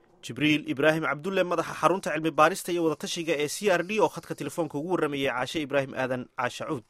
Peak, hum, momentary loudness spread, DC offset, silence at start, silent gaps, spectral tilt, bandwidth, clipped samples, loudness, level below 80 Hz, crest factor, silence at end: -6 dBFS; none; 8 LU; under 0.1%; 0.25 s; none; -4.5 dB/octave; 16 kHz; under 0.1%; -27 LUFS; -66 dBFS; 20 dB; 0.1 s